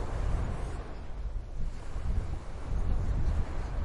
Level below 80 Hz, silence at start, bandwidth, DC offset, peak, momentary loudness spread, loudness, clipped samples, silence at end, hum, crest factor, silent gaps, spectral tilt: -32 dBFS; 0 s; 10.5 kHz; under 0.1%; -18 dBFS; 9 LU; -37 LUFS; under 0.1%; 0 s; none; 14 dB; none; -7 dB/octave